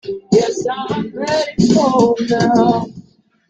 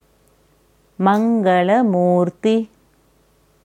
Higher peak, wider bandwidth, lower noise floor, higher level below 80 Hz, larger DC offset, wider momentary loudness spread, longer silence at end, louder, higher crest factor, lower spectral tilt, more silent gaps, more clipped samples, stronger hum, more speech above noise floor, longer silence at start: about the same, -2 dBFS vs -2 dBFS; second, 9 kHz vs 10 kHz; second, -45 dBFS vs -57 dBFS; first, -48 dBFS vs -64 dBFS; neither; first, 9 LU vs 5 LU; second, 0.5 s vs 1 s; about the same, -15 LUFS vs -17 LUFS; about the same, 14 dB vs 18 dB; second, -6 dB/octave vs -8 dB/octave; neither; neither; neither; second, 30 dB vs 42 dB; second, 0.05 s vs 1 s